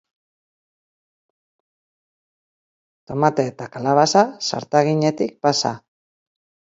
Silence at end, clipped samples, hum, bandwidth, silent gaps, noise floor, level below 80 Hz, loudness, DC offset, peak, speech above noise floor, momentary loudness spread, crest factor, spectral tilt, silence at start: 0.95 s; under 0.1%; none; 7.8 kHz; none; under -90 dBFS; -66 dBFS; -19 LUFS; under 0.1%; 0 dBFS; over 71 dB; 10 LU; 22 dB; -4.5 dB/octave; 3.1 s